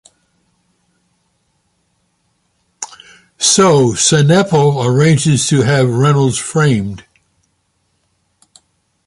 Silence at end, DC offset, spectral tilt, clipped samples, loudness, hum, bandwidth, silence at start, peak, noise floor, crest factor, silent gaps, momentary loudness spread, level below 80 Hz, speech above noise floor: 2.1 s; under 0.1%; -4.5 dB/octave; under 0.1%; -11 LUFS; none; 11.5 kHz; 2.8 s; 0 dBFS; -63 dBFS; 14 dB; none; 18 LU; -48 dBFS; 52 dB